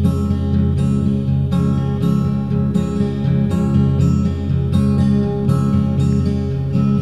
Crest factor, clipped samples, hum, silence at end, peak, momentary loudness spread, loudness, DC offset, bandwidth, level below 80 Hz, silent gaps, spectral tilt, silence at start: 12 dB; under 0.1%; none; 0 s; -4 dBFS; 4 LU; -17 LUFS; 1%; 11 kHz; -32 dBFS; none; -9 dB/octave; 0 s